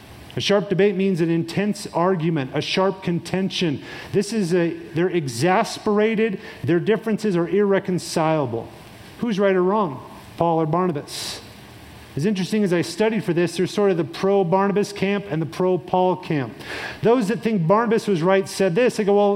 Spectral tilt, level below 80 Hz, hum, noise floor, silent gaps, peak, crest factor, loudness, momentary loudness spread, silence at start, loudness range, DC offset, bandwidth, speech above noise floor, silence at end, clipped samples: -6 dB/octave; -58 dBFS; none; -42 dBFS; none; -4 dBFS; 18 dB; -21 LUFS; 9 LU; 0 s; 3 LU; under 0.1%; 16 kHz; 21 dB; 0 s; under 0.1%